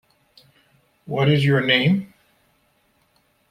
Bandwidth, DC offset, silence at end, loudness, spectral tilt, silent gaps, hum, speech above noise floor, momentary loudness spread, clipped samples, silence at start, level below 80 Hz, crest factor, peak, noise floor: 10 kHz; under 0.1%; 1.45 s; -19 LUFS; -7 dB/octave; none; none; 46 dB; 12 LU; under 0.1%; 1.1 s; -60 dBFS; 20 dB; -4 dBFS; -64 dBFS